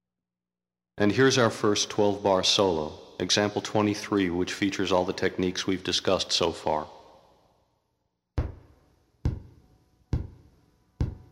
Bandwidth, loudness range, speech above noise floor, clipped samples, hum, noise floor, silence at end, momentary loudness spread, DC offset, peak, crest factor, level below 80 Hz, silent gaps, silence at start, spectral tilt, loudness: 15 kHz; 14 LU; over 65 dB; under 0.1%; none; under -90 dBFS; 0.15 s; 13 LU; under 0.1%; -8 dBFS; 20 dB; -46 dBFS; none; 0.95 s; -4 dB/octave; -26 LUFS